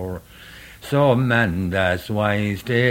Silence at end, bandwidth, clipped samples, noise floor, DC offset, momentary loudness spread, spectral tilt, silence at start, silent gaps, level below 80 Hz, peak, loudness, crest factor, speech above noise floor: 0 s; 17 kHz; under 0.1%; -42 dBFS; under 0.1%; 19 LU; -7 dB/octave; 0 s; none; -46 dBFS; -2 dBFS; -20 LUFS; 18 dB; 23 dB